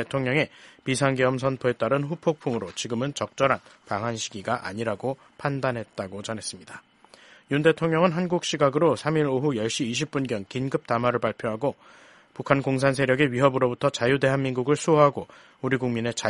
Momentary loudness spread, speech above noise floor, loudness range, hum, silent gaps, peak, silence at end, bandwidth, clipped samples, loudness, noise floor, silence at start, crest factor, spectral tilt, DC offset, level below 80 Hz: 11 LU; 28 dB; 6 LU; none; none; -2 dBFS; 0 s; 11.5 kHz; under 0.1%; -25 LUFS; -53 dBFS; 0 s; 24 dB; -5.5 dB/octave; under 0.1%; -60 dBFS